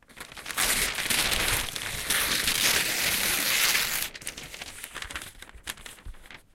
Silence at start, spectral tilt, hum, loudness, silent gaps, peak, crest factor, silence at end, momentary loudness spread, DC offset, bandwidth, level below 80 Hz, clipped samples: 0.1 s; 0 dB/octave; none; -24 LUFS; none; -8 dBFS; 20 dB; 0.15 s; 17 LU; under 0.1%; 17 kHz; -46 dBFS; under 0.1%